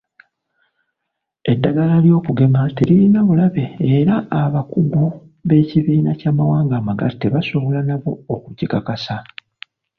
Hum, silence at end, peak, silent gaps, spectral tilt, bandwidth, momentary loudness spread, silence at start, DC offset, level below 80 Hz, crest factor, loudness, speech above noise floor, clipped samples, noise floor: none; 0.75 s; -2 dBFS; none; -10 dB/octave; 5.8 kHz; 11 LU; 1.45 s; under 0.1%; -50 dBFS; 14 dB; -17 LUFS; 63 dB; under 0.1%; -78 dBFS